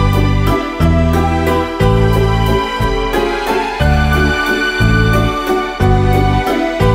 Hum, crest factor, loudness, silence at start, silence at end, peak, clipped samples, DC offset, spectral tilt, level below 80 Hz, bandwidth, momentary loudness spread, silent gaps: none; 12 dB; -13 LUFS; 0 s; 0 s; 0 dBFS; under 0.1%; under 0.1%; -6.5 dB/octave; -20 dBFS; 16.5 kHz; 4 LU; none